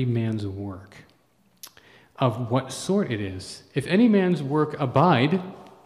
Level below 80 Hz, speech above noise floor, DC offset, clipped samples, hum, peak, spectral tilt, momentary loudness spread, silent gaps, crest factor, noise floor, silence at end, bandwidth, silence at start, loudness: -64 dBFS; 40 dB; under 0.1%; under 0.1%; none; -6 dBFS; -6.5 dB/octave; 17 LU; none; 18 dB; -63 dBFS; 0.15 s; 14 kHz; 0 s; -23 LUFS